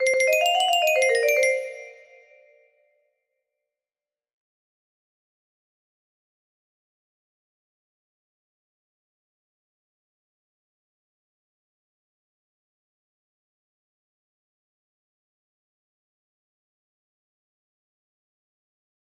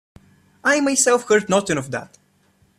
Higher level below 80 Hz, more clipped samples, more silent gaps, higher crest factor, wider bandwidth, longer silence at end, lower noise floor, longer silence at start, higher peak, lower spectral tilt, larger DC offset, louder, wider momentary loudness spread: second, -82 dBFS vs -60 dBFS; neither; neither; about the same, 22 dB vs 18 dB; about the same, 15.5 kHz vs 15 kHz; first, 17.1 s vs 0.75 s; first, under -90 dBFS vs -60 dBFS; second, 0 s vs 0.65 s; second, -10 dBFS vs -4 dBFS; second, 2 dB/octave vs -3 dB/octave; neither; about the same, -20 LUFS vs -18 LUFS; about the same, 12 LU vs 11 LU